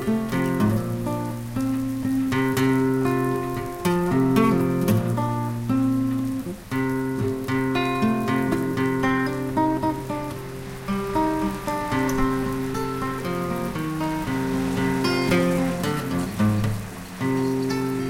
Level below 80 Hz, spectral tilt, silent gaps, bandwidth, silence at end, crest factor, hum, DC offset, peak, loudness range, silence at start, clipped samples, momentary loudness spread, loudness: -42 dBFS; -6.5 dB/octave; none; 17 kHz; 0 s; 18 dB; none; under 0.1%; -6 dBFS; 3 LU; 0 s; under 0.1%; 7 LU; -24 LUFS